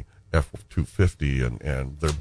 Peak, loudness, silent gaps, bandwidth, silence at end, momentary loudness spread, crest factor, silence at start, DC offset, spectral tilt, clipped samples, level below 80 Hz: -6 dBFS; -27 LUFS; none; 11 kHz; 0 s; 6 LU; 18 dB; 0 s; under 0.1%; -6.5 dB/octave; under 0.1%; -32 dBFS